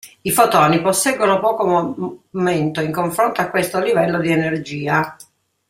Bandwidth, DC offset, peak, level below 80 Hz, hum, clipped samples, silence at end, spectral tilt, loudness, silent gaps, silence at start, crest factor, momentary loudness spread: 16 kHz; under 0.1%; 0 dBFS; -58 dBFS; none; under 0.1%; 0.55 s; -4.5 dB/octave; -17 LUFS; none; 0.05 s; 18 dB; 8 LU